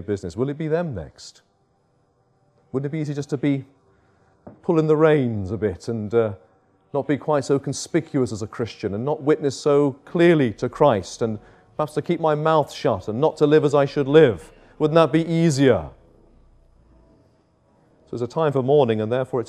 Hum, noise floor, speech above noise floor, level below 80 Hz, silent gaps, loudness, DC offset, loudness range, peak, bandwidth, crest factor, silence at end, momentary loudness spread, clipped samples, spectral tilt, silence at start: none; -64 dBFS; 44 dB; -56 dBFS; none; -21 LUFS; under 0.1%; 9 LU; 0 dBFS; 11 kHz; 20 dB; 0 s; 12 LU; under 0.1%; -6.5 dB/octave; 0 s